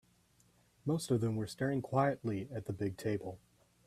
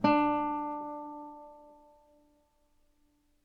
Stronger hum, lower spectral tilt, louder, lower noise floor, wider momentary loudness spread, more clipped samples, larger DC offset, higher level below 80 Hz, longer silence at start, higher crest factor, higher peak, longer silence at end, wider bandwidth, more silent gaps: second, none vs 50 Hz at -80 dBFS; about the same, -7 dB/octave vs -7.5 dB/octave; second, -36 LUFS vs -32 LUFS; about the same, -70 dBFS vs -70 dBFS; second, 10 LU vs 23 LU; neither; neither; about the same, -68 dBFS vs -66 dBFS; first, 0.85 s vs 0 s; about the same, 20 dB vs 22 dB; second, -18 dBFS vs -12 dBFS; second, 0.5 s vs 1.75 s; first, 14.5 kHz vs 6 kHz; neither